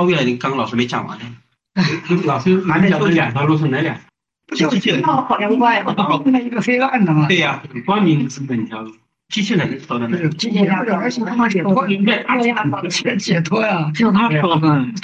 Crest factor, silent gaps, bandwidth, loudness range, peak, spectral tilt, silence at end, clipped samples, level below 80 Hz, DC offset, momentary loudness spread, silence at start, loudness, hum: 12 dB; none; 8.4 kHz; 3 LU; -4 dBFS; -6 dB/octave; 0 s; under 0.1%; -58 dBFS; under 0.1%; 9 LU; 0 s; -16 LUFS; none